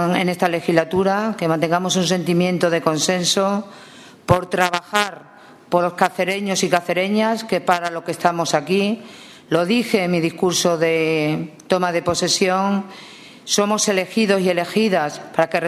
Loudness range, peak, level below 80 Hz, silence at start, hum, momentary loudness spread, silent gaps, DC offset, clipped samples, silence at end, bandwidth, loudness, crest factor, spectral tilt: 2 LU; 0 dBFS; -56 dBFS; 0 s; none; 6 LU; none; under 0.1%; under 0.1%; 0 s; 14 kHz; -19 LUFS; 18 dB; -4 dB/octave